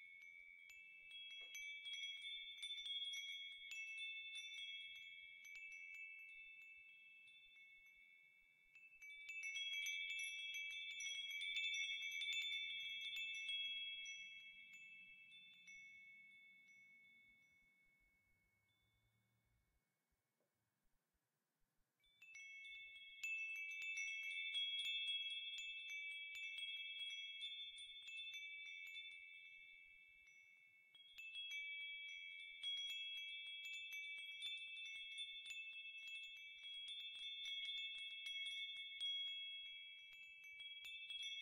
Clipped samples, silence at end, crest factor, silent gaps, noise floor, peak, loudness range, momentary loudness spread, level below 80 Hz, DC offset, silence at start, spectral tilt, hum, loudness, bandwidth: under 0.1%; 0 s; 18 dB; none; under -90 dBFS; -34 dBFS; 14 LU; 18 LU; under -90 dBFS; under 0.1%; 0 s; 4 dB/octave; none; -48 LUFS; 15.5 kHz